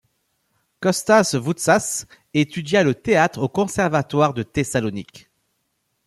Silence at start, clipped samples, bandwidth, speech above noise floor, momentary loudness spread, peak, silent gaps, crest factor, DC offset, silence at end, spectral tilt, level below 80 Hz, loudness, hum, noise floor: 0.8 s; under 0.1%; 15 kHz; 52 dB; 9 LU; -2 dBFS; none; 18 dB; under 0.1%; 0.9 s; -4.5 dB/octave; -54 dBFS; -20 LUFS; none; -72 dBFS